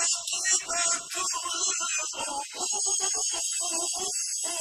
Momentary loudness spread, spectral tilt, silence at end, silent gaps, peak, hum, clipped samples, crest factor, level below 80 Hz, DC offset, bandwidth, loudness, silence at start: 5 LU; 2 dB/octave; 0 s; none; -12 dBFS; none; under 0.1%; 18 dB; -68 dBFS; under 0.1%; 14 kHz; -26 LUFS; 0 s